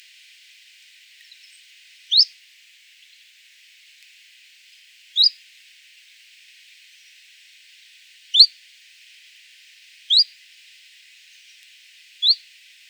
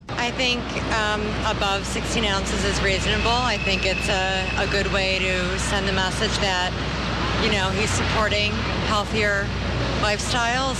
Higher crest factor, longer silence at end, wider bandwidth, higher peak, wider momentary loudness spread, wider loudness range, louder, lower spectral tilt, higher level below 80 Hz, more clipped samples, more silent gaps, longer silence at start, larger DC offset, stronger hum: first, 26 dB vs 14 dB; first, 0.55 s vs 0 s; first, over 20 kHz vs 13 kHz; first, 0 dBFS vs -8 dBFS; first, 9 LU vs 4 LU; first, 6 LU vs 1 LU; first, -16 LUFS vs -22 LUFS; second, 10 dB/octave vs -4 dB/octave; second, under -90 dBFS vs -32 dBFS; neither; neither; first, 2.1 s vs 0.05 s; neither; neither